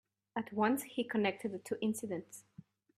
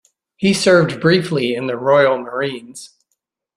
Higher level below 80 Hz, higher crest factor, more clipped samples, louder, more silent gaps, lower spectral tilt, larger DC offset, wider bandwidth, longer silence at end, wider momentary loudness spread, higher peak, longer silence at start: second, -80 dBFS vs -56 dBFS; about the same, 20 dB vs 16 dB; neither; second, -37 LUFS vs -16 LUFS; neither; about the same, -5 dB/octave vs -5 dB/octave; neither; first, 15.5 kHz vs 13 kHz; about the same, 0.6 s vs 0.7 s; second, 11 LU vs 14 LU; second, -18 dBFS vs 0 dBFS; about the same, 0.35 s vs 0.4 s